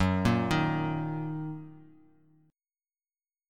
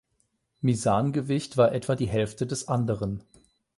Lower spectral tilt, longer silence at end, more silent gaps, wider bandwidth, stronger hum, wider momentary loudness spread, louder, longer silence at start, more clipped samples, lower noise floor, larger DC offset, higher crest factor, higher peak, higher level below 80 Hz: about the same, -7 dB/octave vs -6.5 dB/octave; first, 1.65 s vs 0.55 s; neither; first, 14 kHz vs 11.5 kHz; neither; first, 16 LU vs 8 LU; second, -30 LUFS vs -26 LUFS; second, 0 s vs 0.6 s; neither; first, under -90 dBFS vs -73 dBFS; neither; about the same, 20 dB vs 20 dB; second, -12 dBFS vs -8 dBFS; about the same, -52 dBFS vs -52 dBFS